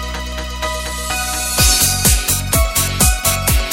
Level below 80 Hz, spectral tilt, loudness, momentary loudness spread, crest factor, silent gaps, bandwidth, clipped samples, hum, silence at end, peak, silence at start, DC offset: -22 dBFS; -2 dB/octave; -15 LUFS; 11 LU; 16 dB; none; 17 kHz; under 0.1%; none; 0 s; 0 dBFS; 0 s; under 0.1%